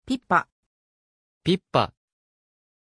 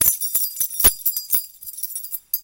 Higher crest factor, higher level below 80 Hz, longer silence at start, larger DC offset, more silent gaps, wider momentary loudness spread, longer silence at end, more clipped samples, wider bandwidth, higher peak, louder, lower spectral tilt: about the same, 24 dB vs 22 dB; second, -58 dBFS vs -42 dBFS; about the same, 0.05 s vs 0 s; neither; first, 0.52-1.41 s vs none; second, 8 LU vs 13 LU; first, 0.95 s vs 0 s; neither; second, 10.5 kHz vs 18 kHz; second, -4 dBFS vs 0 dBFS; second, -25 LUFS vs -19 LUFS; first, -6 dB/octave vs 0 dB/octave